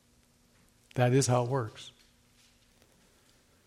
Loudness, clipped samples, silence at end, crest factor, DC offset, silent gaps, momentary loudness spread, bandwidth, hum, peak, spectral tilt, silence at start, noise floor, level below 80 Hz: -29 LUFS; under 0.1%; 1.8 s; 22 dB; under 0.1%; none; 21 LU; 13 kHz; none; -12 dBFS; -5.5 dB/octave; 0.95 s; -66 dBFS; -68 dBFS